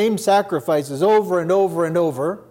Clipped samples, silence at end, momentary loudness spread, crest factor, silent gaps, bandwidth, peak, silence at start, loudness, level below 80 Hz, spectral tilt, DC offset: under 0.1%; 0.1 s; 5 LU; 12 dB; none; 17 kHz; -6 dBFS; 0 s; -19 LUFS; -68 dBFS; -5.5 dB/octave; under 0.1%